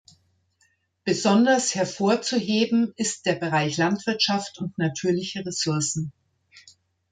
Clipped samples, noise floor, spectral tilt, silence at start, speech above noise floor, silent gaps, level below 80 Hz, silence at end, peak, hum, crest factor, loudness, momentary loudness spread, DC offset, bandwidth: under 0.1%; -67 dBFS; -4 dB/octave; 1.05 s; 44 dB; none; -66 dBFS; 0.5 s; -8 dBFS; none; 18 dB; -24 LUFS; 8 LU; under 0.1%; 9.6 kHz